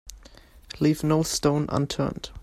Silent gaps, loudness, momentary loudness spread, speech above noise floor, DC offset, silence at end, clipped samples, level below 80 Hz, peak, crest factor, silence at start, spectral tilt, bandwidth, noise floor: none; -25 LUFS; 12 LU; 26 dB; under 0.1%; 0 s; under 0.1%; -46 dBFS; -8 dBFS; 18 dB; 0.05 s; -5.5 dB/octave; 14 kHz; -50 dBFS